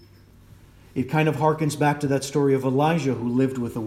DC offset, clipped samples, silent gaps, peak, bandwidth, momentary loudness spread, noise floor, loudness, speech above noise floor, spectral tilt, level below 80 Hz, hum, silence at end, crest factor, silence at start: under 0.1%; under 0.1%; none; -6 dBFS; 15 kHz; 4 LU; -50 dBFS; -23 LUFS; 28 dB; -6.5 dB/octave; -56 dBFS; none; 0 s; 18 dB; 0.95 s